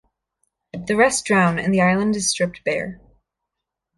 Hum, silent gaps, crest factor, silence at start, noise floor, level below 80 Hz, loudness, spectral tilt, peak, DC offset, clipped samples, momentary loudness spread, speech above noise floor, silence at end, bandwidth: none; none; 18 dB; 0.75 s; -82 dBFS; -54 dBFS; -19 LUFS; -4.5 dB/octave; -4 dBFS; under 0.1%; under 0.1%; 13 LU; 63 dB; 1.05 s; 11.5 kHz